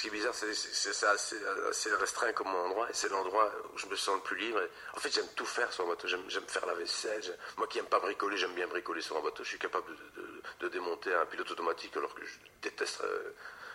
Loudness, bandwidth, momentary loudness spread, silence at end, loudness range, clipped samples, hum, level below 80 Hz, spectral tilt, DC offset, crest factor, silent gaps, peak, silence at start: -35 LUFS; 16 kHz; 10 LU; 0 s; 4 LU; under 0.1%; none; -74 dBFS; -0.5 dB/octave; under 0.1%; 22 dB; none; -14 dBFS; 0 s